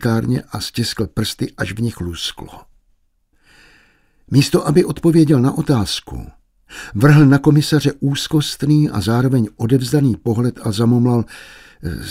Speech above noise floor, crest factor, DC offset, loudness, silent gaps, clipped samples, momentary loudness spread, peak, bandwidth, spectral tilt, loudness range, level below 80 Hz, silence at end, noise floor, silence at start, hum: 44 dB; 16 dB; under 0.1%; -16 LUFS; none; under 0.1%; 15 LU; 0 dBFS; 16 kHz; -6.5 dB/octave; 9 LU; -42 dBFS; 0 s; -60 dBFS; 0 s; none